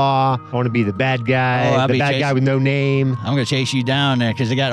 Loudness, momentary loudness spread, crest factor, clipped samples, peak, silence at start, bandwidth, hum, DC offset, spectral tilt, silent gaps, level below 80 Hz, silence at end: -18 LUFS; 3 LU; 12 dB; under 0.1%; -6 dBFS; 0 s; 10.5 kHz; none; under 0.1%; -6 dB/octave; none; -58 dBFS; 0 s